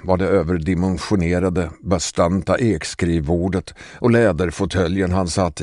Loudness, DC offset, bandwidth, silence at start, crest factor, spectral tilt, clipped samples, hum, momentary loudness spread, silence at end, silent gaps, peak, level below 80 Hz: -19 LUFS; under 0.1%; 11 kHz; 0.05 s; 16 dB; -6 dB/octave; under 0.1%; none; 5 LU; 0 s; none; -2 dBFS; -36 dBFS